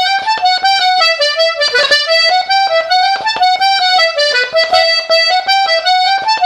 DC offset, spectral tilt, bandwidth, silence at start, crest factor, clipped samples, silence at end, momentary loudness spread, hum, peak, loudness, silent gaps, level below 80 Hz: under 0.1%; 1.5 dB/octave; 13.5 kHz; 0 s; 12 dB; under 0.1%; 0 s; 3 LU; none; 0 dBFS; -10 LUFS; none; -56 dBFS